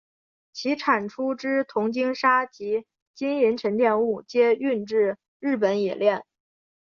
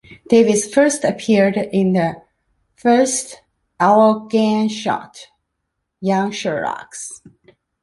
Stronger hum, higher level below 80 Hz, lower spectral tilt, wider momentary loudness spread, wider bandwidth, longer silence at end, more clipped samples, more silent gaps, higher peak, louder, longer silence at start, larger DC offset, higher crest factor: neither; second, -72 dBFS vs -60 dBFS; about the same, -5.5 dB/octave vs -5 dB/octave; second, 8 LU vs 13 LU; second, 7 kHz vs 11.5 kHz; about the same, 0.6 s vs 0.65 s; neither; first, 3.02-3.14 s, 5.28-5.40 s vs none; second, -6 dBFS vs 0 dBFS; second, -24 LUFS vs -17 LUFS; first, 0.55 s vs 0.1 s; neither; about the same, 18 dB vs 18 dB